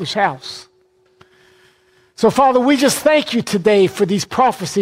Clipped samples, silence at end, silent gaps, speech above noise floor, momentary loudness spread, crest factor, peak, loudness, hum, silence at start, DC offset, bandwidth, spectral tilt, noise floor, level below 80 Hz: under 0.1%; 0 s; none; 42 dB; 7 LU; 14 dB; -2 dBFS; -15 LUFS; none; 0 s; under 0.1%; 16 kHz; -4.5 dB/octave; -57 dBFS; -56 dBFS